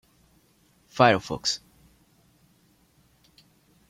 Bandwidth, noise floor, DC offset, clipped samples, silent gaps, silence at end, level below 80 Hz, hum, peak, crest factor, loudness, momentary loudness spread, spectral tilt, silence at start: 16 kHz; -63 dBFS; under 0.1%; under 0.1%; none; 2.3 s; -62 dBFS; none; -4 dBFS; 26 dB; -23 LUFS; 14 LU; -4 dB/octave; 0.95 s